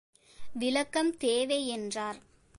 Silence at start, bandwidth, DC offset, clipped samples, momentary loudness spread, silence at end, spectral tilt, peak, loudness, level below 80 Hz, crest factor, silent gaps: 0.4 s; 11.5 kHz; under 0.1%; under 0.1%; 11 LU; 0.35 s; -2.5 dB/octave; -16 dBFS; -31 LUFS; -66 dBFS; 16 dB; none